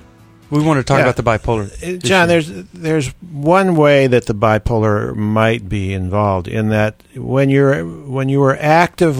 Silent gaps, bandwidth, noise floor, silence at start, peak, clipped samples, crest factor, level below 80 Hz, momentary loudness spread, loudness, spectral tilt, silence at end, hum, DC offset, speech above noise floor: none; 14.5 kHz; -44 dBFS; 0.5 s; 0 dBFS; under 0.1%; 14 dB; -38 dBFS; 9 LU; -15 LUFS; -6.5 dB/octave; 0 s; none; under 0.1%; 29 dB